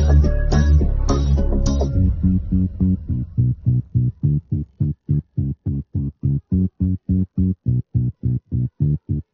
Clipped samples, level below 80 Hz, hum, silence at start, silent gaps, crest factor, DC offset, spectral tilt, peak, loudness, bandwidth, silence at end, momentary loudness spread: under 0.1%; -22 dBFS; none; 0 s; none; 14 dB; under 0.1%; -9.5 dB/octave; -4 dBFS; -21 LUFS; 7 kHz; 0.1 s; 7 LU